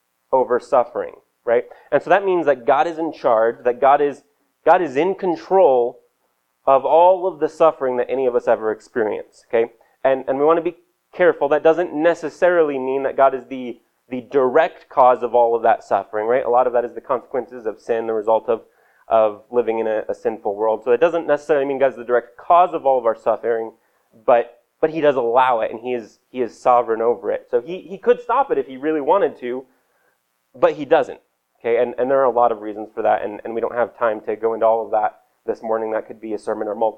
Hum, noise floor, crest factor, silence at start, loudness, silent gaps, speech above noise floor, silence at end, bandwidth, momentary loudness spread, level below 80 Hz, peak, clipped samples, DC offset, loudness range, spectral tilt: none; -68 dBFS; 18 dB; 0.3 s; -19 LUFS; none; 50 dB; 0.05 s; 8.6 kHz; 11 LU; -62 dBFS; -2 dBFS; under 0.1%; under 0.1%; 4 LU; -6.5 dB/octave